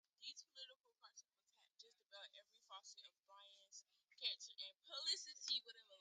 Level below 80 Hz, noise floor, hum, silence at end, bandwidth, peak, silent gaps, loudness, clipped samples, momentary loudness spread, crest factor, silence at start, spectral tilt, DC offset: under -90 dBFS; -82 dBFS; none; 0 s; 9 kHz; -30 dBFS; 0.76-0.80 s; -48 LUFS; under 0.1%; 22 LU; 24 dB; 0.2 s; 4.5 dB/octave; under 0.1%